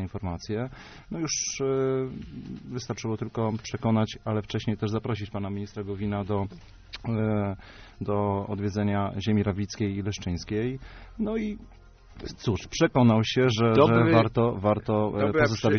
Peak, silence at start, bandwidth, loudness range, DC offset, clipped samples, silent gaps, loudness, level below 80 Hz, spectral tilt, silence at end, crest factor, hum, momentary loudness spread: -6 dBFS; 0 s; 6.6 kHz; 8 LU; under 0.1%; under 0.1%; none; -27 LUFS; -50 dBFS; -6 dB/octave; 0 s; 20 dB; none; 16 LU